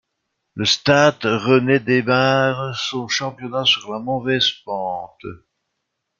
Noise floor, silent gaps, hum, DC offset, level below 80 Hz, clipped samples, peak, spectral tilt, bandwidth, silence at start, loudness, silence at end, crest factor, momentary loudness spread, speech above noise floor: -77 dBFS; none; none; under 0.1%; -58 dBFS; under 0.1%; -2 dBFS; -4.5 dB/octave; 7.6 kHz; 0.55 s; -18 LUFS; 0.85 s; 18 dB; 12 LU; 58 dB